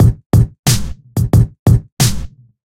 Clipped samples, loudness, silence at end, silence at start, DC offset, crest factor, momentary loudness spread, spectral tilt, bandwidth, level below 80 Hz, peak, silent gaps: under 0.1%; -14 LUFS; 0.4 s; 0 s; under 0.1%; 14 dB; 10 LU; -5.5 dB/octave; 16.5 kHz; -22 dBFS; 0 dBFS; 0.26-0.30 s, 0.59-0.63 s, 1.59-1.66 s, 1.92-1.97 s